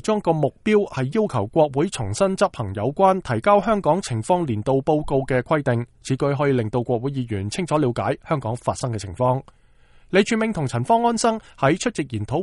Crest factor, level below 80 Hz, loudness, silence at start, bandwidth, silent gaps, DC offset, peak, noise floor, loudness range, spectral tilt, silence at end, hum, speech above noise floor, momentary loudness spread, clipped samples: 18 dB; -48 dBFS; -22 LUFS; 0.05 s; 11.5 kHz; none; under 0.1%; -4 dBFS; -52 dBFS; 3 LU; -6 dB/octave; 0 s; none; 31 dB; 7 LU; under 0.1%